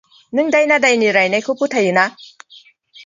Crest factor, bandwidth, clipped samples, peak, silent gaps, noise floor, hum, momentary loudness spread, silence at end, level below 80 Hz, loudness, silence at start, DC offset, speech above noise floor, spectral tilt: 16 dB; 9.6 kHz; under 0.1%; 0 dBFS; none; -47 dBFS; none; 8 LU; 0.05 s; -68 dBFS; -15 LUFS; 0.35 s; under 0.1%; 32 dB; -4 dB/octave